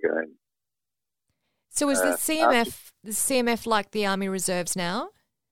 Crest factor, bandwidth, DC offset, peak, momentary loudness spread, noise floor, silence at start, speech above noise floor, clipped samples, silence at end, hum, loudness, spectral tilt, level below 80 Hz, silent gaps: 20 dB; 19.5 kHz; under 0.1%; -8 dBFS; 10 LU; -89 dBFS; 0 s; 64 dB; under 0.1%; 0 s; none; -25 LUFS; -3 dB/octave; -60 dBFS; none